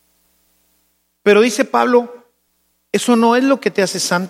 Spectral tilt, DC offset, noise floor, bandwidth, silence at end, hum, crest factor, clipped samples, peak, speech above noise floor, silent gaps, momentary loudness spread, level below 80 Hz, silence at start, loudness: -4 dB/octave; under 0.1%; -64 dBFS; 15.5 kHz; 0 s; none; 16 dB; under 0.1%; 0 dBFS; 51 dB; none; 7 LU; -72 dBFS; 1.25 s; -15 LUFS